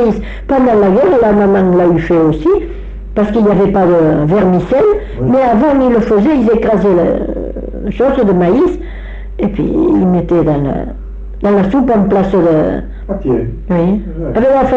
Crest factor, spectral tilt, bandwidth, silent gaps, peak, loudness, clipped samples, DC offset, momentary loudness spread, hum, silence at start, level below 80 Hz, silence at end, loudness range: 8 dB; -9.5 dB/octave; 7.4 kHz; none; -2 dBFS; -11 LUFS; under 0.1%; under 0.1%; 12 LU; none; 0 s; -26 dBFS; 0 s; 3 LU